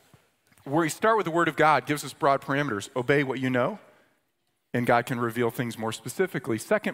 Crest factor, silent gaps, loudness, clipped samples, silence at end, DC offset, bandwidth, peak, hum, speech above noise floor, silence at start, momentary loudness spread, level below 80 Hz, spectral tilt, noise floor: 20 dB; none; -26 LUFS; under 0.1%; 0 s; under 0.1%; 16 kHz; -6 dBFS; none; 50 dB; 0.65 s; 9 LU; -68 dBFS; -5.5 dB/octave; -76 dBFS